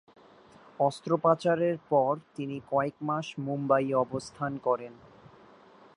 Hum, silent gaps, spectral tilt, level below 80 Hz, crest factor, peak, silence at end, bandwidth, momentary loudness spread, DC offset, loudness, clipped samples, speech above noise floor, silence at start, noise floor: none; none; -7 dB/octave; -70 dBFS; 20 dB; -10 dBFS; 1.05 s; 11 kHz; 9 LU; under 0.1%; -29 LUFS; under 0.1%; 27 dB; 0.8 s; -56 dBFS